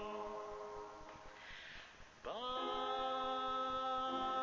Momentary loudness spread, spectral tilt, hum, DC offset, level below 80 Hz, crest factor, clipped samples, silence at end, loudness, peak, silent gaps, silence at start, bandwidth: 15 LU; -3.5 dB/octave; none; under 0.1%; -66 dBFS; 14 dB; under 0.1%; 0 s; -42 LUFS; -30 dBFS; none; 0 s; 7.6 kHz